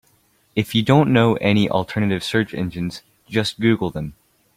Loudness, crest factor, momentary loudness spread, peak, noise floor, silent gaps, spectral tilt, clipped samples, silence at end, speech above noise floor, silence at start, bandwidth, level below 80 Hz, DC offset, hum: -20 LUFS; 18 dB; 13 LU; -2 dBFS; -60 dBFS; none; -6.5 dB/octave; under 0.1%; 0.45 s; 41 dB; 0.55 s; 16 kHz; -50 dBFS; under 0.1%; none